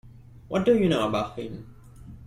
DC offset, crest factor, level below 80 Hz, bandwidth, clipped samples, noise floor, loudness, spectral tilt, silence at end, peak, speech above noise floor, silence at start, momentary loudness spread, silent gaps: under 0.1%; 16 dB; -52 dBFS; 15.5 kHz; under 0.1%; -45 dBFS; -24 LUFS; -6.5 dB/octave; 0 s; -10 dBFS; 21 dB; 0.05 s; 17 LU; none